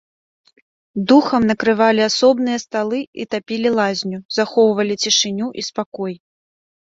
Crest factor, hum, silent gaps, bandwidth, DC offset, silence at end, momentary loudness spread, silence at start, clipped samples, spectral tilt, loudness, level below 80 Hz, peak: 16 dB; none; 3.07-3.13 s, 4.25-4.29 s, 5.86-5.92 s; 7.8 kHz; under 0.1%; 0.7 s; 11 LU; 0.95 s; under 0.1%; -3.5 dB/octave; -17 LUFS; -60 dBFS; -2 dBFS